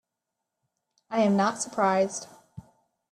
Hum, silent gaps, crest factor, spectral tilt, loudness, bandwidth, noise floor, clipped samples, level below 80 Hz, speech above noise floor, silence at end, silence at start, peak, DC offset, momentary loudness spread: none; none; 20 dB; -5 dB/octave; -26 LUFS; 12.5 kHz; -85 dBFS; under 0.1%; -70 dBFS; 60 dB; 0.5 s; 1.1 s; -10 dBFS; under 0.1%; 12 LU